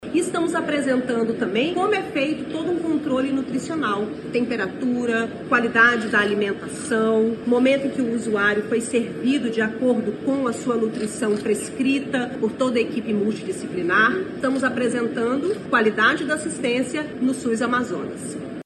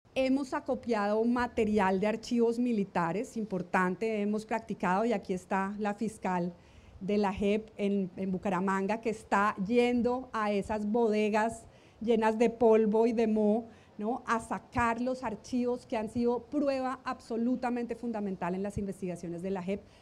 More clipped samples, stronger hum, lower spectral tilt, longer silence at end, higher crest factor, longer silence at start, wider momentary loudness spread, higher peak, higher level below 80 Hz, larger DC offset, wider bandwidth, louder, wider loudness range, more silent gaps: neither; neither; second, -4.5 dB/octave vs -6.5 dB/octave; second, 0.05 s vs 0.2 s; about the same, 18 dB vs 16 dB; second, 0 s vs 0.15 s; about the same, 7 LU vs 9 LU; first, -4 dBFS vs -14 dBFS; about the same, -58 dBFS vs -60 dBFS; neither; about the same, 12.5 kHz vs 12 kHz; first, -22 LUFS vs -31 LUFS; about the same, 3 LU vs 4 LU; neither